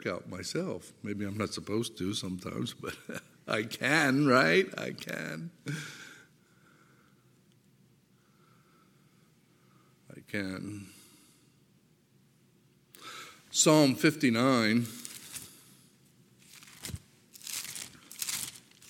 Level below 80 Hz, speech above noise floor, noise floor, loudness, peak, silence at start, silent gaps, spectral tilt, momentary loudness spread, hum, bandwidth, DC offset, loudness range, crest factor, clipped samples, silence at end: -70 dBFS; 36 dB; -66 dBFS; -30 LUFS; -8 dBFS; 0 s; none; -4 dB/octave; 21 LU; none; 17 kHz; under 0.1%; 16 LU; 24 dB; under 0.1%; 0.3 s